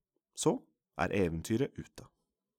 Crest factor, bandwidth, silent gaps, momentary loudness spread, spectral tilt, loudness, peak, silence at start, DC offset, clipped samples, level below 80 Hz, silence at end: 20 dB; 17.5 kHz; none; 17 LU; -5.5 dB/octave; -34 LUFS; -16 dBFS; 0.35 s; under 0.1%; under 0.1%; -58 dBFS; 0.55 s